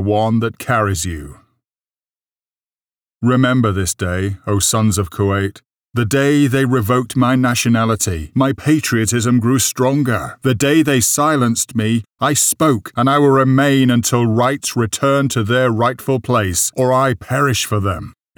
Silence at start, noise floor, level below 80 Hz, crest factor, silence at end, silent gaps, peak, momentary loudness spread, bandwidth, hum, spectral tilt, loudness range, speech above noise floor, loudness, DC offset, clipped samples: 0 s; under -90 dBFS; -42 dBFS; 12 dB; 0.25 s; 2.32-2.36 s, 2.66-2.70 s; -4 dBFS; 7 LU; over 20 kHz; none; -5 dB/octave; 6 LU; over 75 dB; -15 LUFS; under 0.1%; under 0.1%